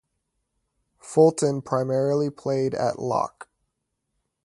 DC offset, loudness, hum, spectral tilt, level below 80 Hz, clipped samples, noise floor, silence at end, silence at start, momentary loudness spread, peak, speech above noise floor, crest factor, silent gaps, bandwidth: under 0.1%; -24 LUFS; none; -6.5 dB/octave; -66 dBFS; under 0.1%; -79 dBFS; 1 s; 1.05 s; 7 LU; -4 dBFS; 56 dB; 20 dB; none; 11.5 kHz